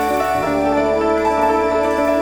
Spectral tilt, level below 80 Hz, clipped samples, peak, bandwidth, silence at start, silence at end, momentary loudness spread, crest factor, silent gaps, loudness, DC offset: -5.5 dB/octave; -38 dBFS; under 0.1%; -6 dBFS; over 20 kHz; 0 s; 0 s; 2 LU; 10 dB; none; -17 LUFS; under 0.1%